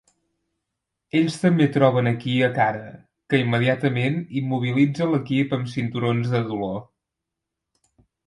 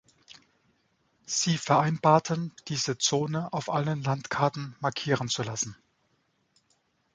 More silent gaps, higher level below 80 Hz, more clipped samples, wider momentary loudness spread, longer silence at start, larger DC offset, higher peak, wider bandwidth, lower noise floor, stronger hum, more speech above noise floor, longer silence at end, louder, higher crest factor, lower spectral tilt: neither; about the same, -62 dBFS vs -66 dBFS; neither; about the same, 8 LU vs 9 LU; second, 1.15 s vs 1.3 s; neither; about the same, -4 dBFS vs -6 dBFS; first, 11.5 kHz vs 9.6 kHz; first, -84 dBFS vs -72 dBFS; neither; first, 62 dB vs 45 dB; about the same, 1.45 s vs 1.4 s; first, -22 LUFS vs -28 LUFS; about the same, 20 dB vs 24 dB; first, -7.5 dB/octave vs -4 dB/octave